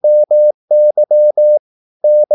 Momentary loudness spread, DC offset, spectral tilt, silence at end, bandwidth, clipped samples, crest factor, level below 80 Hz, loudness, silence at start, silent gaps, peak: 4 LU; under 0.1%; -10.5 dB/octave; 0 s; 0.9 kHz; under 0.1%; 6 dB; -84 dBFS; -11 LUFS; 0.05 s; 0.54-0.68 s, 1.59-2.00 s; -4 dBFS